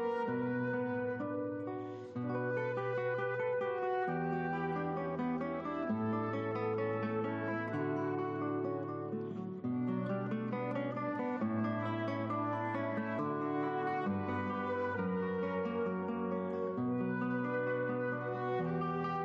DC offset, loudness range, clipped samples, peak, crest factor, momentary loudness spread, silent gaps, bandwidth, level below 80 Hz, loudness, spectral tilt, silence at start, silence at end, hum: under 0.1%; 1 LU; under 0.1%; -26 dBFS; 10 dB; 3 LU; none; 7 kHz; -74 dBFS; -37 LUFS; -9.5 dB/octave; 0 s; 0 s; none